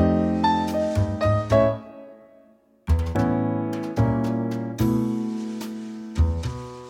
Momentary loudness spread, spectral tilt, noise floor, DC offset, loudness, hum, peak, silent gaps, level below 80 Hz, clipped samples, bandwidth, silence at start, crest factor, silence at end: 12 LU; -8 dB/octave; -56 dBFS; under 0.1%; -24 LUFS; none; -6 dBFS; none; -34 dBFS; under 0.1%; 17 kHz; 0 s; 18 dB; 0 s